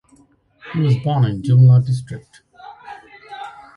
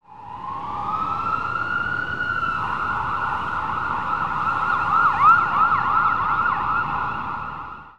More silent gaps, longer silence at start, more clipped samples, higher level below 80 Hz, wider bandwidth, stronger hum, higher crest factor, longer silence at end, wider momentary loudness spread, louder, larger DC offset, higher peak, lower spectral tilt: neither; first, 0.65 s vs 0 s; neither; about the same, -52 dBFS vs -48 dBFS; first, 10.5 kHz vs 8.8 kHz; neither; about the same, 16 dB vs 16 dB; first, 0.25 s vs 0 s; first, 26 LU vs 13 LU; first, -16 LUFS vs -21 LUFS; second, under 0.1% vs 1%; about the same, -4 dBFS vs -6 dBFS; first, -8.5 dB/octave vs -5.5 dB/octave